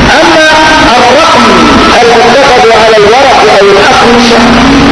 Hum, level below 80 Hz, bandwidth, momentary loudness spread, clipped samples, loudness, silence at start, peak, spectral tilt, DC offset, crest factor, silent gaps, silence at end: none; -22 dBFS; 11 kHz; 1 LU; 20%; -2 LUFS; 0 s; 0 dBFS; -3.5 dB/octave; under 0.1%; 2 dB; none; 0 s